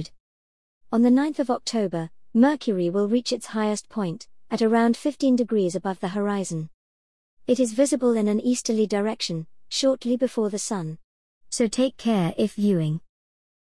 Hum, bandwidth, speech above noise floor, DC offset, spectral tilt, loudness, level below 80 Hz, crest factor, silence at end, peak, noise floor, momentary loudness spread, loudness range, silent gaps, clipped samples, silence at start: none; 12 kHz; over 67 dB; 0.3%; -5.5 dB/octave; -24 LUFS; -64 dBFS; 16 dB; 0.75 s; -8 dBFS; under -90 dBFS; 11 LU; 2 LU; 0.20-0.81 s, 6.74-7.37 s, 11.04-11.41 s; under 0.1%; 0 s